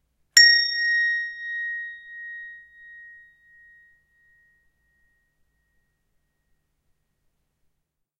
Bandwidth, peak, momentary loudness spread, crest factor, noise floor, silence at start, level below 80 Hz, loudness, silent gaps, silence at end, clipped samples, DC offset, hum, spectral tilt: 15.5 kHz; 0 dBFS; 24 LU; 28 dB; -77 dBFS; 0.35 s; -74 dBFS; -18 LUFS; none; 5.15 s; under 0.1%; under 0.1%; none; 6.5 dB/octave